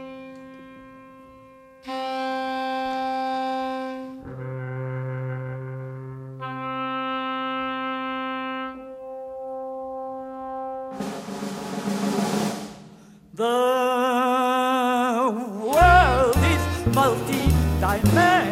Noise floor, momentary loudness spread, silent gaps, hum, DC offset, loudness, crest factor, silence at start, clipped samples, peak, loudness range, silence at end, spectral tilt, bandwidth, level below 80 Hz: -48 dBFS; 17 LU; none; none; under 0.1%; -24 LUFS; 20 dB; 0 s; under 0.1%; -4 dBFS; 12 LU; 0 s; -5.5 dB/octave; 16 kHz; -36 dBFS